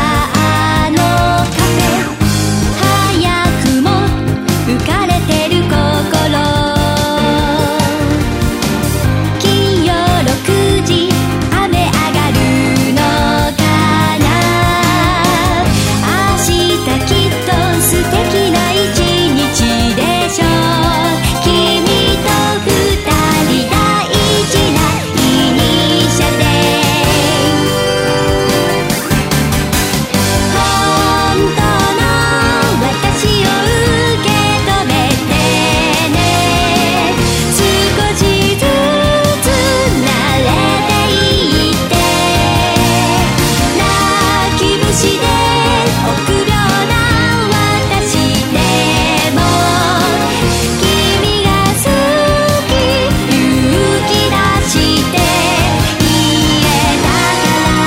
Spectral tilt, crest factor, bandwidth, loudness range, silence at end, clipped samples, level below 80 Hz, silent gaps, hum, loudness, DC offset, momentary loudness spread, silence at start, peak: -4.5 dB/octave; 12 dB; 16.5 kHz; 2 LU; 0 s; under 0.1%; -24 dBFS; none; none; -11 LUFS; under 0.1%; 2 LU; 0 s; 0 dBFS